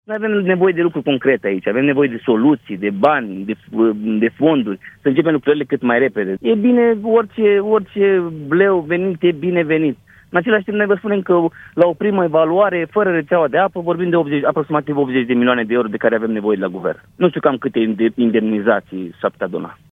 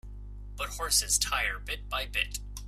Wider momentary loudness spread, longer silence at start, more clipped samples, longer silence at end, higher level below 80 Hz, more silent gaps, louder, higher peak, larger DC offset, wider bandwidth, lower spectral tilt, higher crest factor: second, 7 LU vs 20 LU; about the same, 0.1 s vs 0.05 s; neither; first, 0.2 s vs 0 s; second, -60 dBFS vs -42 dBFS; neither; first, -16 LUFS vs -29 LUFS; first, 0 dBFS vs -12 dBFS; neither; second, 3.9 kHz vs 16 kHz; first, -9 dB/octave vs 0 dB/octave; about the same, 16 dB vs 20 dB